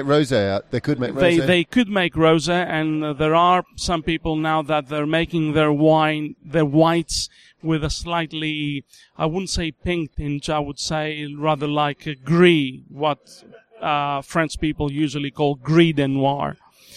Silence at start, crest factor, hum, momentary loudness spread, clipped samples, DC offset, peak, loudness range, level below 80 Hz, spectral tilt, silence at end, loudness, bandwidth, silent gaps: 0 s; 20 dB; none; 9 LU; under 0.1%; under 0.1%; -2 dBFS; 6 LU; -42 dBFS; -5.5 dB/octave; 0 s; -20 LUFS; 13.5 kHz; none